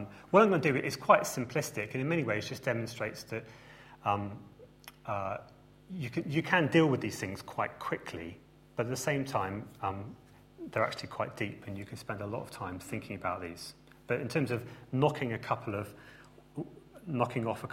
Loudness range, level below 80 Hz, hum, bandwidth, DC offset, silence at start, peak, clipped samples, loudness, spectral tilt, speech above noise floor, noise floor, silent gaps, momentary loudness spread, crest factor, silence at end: 6 LU; -66 dBFS; none; 16 kHz; under 0.1%; 0 s; -8 dBFS; under 0.1%; -33 LUFS; -5.5 dB/octave; 22 dB; -54 dBFS; none; 20 LU; 26 dB; 0 s